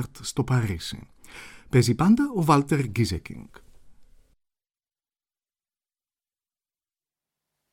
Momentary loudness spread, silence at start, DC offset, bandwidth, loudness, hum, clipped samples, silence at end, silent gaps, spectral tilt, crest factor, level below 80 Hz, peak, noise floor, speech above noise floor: 23 LU; 0 s; under 0.1%; 16.5 kHz; -23 LUFS; none; under 0.1%; 3.7 s; none; -6.5 dB/octave; 22 dB; -50 dBFS; -6 dBFS; under -90 dBFS; over 67 dB